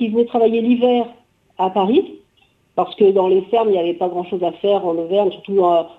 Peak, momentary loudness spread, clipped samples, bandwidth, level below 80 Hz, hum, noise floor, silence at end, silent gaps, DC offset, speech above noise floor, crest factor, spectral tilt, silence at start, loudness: -4 dBFS; 8 LU; under 0.1%; 4.2 kHz; -64 dBFS; none; -58 dBFS; 0.1 s; none; under 0.1%; 42 dB; 14 dB; -8.5 dB/octave; 0 s; -17 LUFS